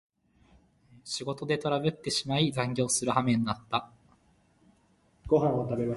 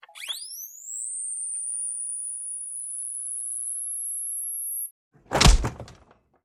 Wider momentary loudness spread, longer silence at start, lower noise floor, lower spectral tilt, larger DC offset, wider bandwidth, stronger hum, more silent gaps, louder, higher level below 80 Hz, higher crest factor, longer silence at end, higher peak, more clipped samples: second, 9 LU vs 14 LU; first, 1.05 s vs 0.1 s; first, -66 dBFS vs -58 dBFS; first, -4.5 dB/octave vs -2.5 dB/octave; neither; second, 12 kHz vs 16 kHz; neither; second, none vs 4.91-5.11 s; about the same, -29 LUFS vs -27 LUFS; second, -58 dBFS vs -32 dBFS; second, 20 dB vs 26 dB; second, 0 s vs 0.5 s; second, -10 dBFS vs -2 dBFS; neither